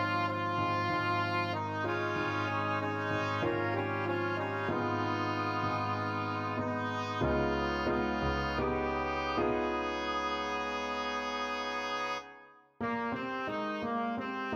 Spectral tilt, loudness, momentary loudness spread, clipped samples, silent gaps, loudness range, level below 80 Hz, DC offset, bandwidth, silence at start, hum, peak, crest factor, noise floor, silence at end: -6 dB/octave; -33 LUFS; 4 LU; under 0.1%; none; 3 LU; -52 dBFS; under 0.1%; 14.5 kHz; 0 s; none; -18 dBFS; 16 dB; -56 dBFS; 0 s